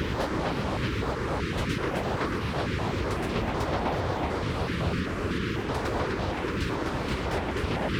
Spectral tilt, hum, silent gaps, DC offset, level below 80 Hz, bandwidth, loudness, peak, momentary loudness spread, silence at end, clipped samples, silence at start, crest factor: -6 dB/octave; none; none; under 0.1%; -38 dBFS; 17.5 kHz; -29 LUFS; -14 dBFS; 1 LU; 0 s; under 0.1%; 0 s; 14 dB